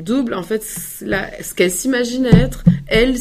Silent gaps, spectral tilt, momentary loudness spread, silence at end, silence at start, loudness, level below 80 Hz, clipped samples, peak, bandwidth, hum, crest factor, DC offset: none; -5.5 dB/octave; 10 LU; 0 s; 0 s; -17 LUFS; -30 dBFS; under 0.1%; 0 dBFS; 15.5 kHz; none; 16 dB; under 0.1%